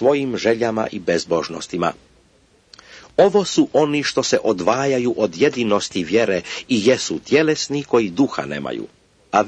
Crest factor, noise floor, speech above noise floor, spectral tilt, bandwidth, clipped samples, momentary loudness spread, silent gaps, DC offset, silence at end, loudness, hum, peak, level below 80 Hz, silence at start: 18 dB; -56 dBFS; 37 dB; -4.5 dB/octave; 9.8 kHz; under 0.1%; 8 LU; none; under 0.1%; 0 s; -19 LUFS; none; -2 dBFS; -56 dBFS; 0 s